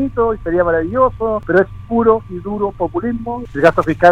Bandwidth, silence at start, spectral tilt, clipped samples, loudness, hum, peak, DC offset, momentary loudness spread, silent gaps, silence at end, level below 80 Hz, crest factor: 9.4 kHz; 0 s; -8 dB/octave; under 0.1%; -16 LUFS; none; 0 dBFS; under 0.1%; 8 LU; none; 0 s; -36 dBFS; 14 dB